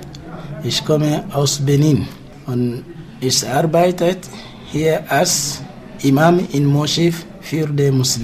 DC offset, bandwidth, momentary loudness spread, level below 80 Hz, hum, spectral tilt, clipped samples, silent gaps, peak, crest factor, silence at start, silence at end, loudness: under 0.1%; 16 kHz; 16 LU; -46 dBFS; none; -5 dB/octave; under 0.1%; none; -2 dBFS; 16 dB; 0 s; 0 s; -17 LUFS